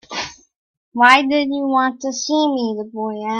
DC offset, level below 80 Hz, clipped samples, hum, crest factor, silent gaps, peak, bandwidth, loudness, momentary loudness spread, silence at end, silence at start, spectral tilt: under 0.1%; -62 dBFS; under 0.1%; none; 18 dB; 0.56-0.92 s; 0 dBFS; 11.5 kHz; -17 LUFS; 15 LU; 0 s; 0.1 s; -2.5 dB/octave